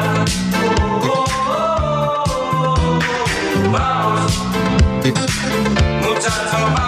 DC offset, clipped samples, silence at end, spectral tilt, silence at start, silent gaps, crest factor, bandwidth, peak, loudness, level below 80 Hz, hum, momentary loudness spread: under 0.1%; under 0.1%; 0 s; -5 dB/octave; 0 s; none; 14 dB; 15.5 kHz; -2 dBFS; -17 LUFS; -26 dBFS; none; 2 LU